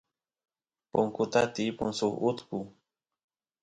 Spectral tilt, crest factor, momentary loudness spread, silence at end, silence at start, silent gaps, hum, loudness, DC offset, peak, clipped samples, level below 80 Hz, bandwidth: -5 dB/octave; 22 dB; 12 LU; 0.95 s; 0.95 s; none; none; -30 LUFS; under 0.1%; -12 dBFS; under 0.1%; -64 dBFS; 10.5 kHz